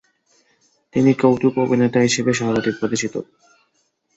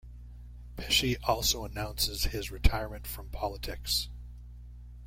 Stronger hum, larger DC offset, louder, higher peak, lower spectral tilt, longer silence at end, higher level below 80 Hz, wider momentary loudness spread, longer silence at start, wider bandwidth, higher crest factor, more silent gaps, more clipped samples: second, none vs 60 Hz at -40 dBFS; neither; first, -18 LUFS vs -31 LUFS; first, -2 dBFS vs -8 dBFS; first, -5 dB/octave vs -3 dB/octave; first, 0.95 s vs 0 s; second, -56 dBFS vs -38 dBFS; second, 9 LU vs 22 LU; first, 0.95 s vs 0.05 s; second, 8 kHz vs 16.5 kHz; second, 18 dB vs 26 dB; neither; neither